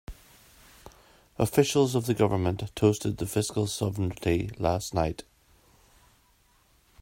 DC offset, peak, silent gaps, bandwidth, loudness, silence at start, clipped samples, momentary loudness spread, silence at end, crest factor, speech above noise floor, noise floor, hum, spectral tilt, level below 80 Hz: under 0.1%; -8 dBFS; none; 16 kHz; -27 LUFS; 0.1 s; under 0.1%; 7 LU; 1.8 s; 22 dB; 38 dB; -64 dBFS; none; -5.5 dB/octave; -50 dBFS